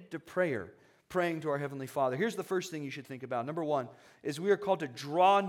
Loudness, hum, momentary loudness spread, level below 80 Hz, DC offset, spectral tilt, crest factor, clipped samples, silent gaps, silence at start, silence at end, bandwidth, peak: -33 LUFS; none; 11 LU; -78 dBFS; under 0.1%; -5.5 dB/octave; 20 dB; under 0.1%; none; 0 s; 0 s; 17 kHz; -12 dBFS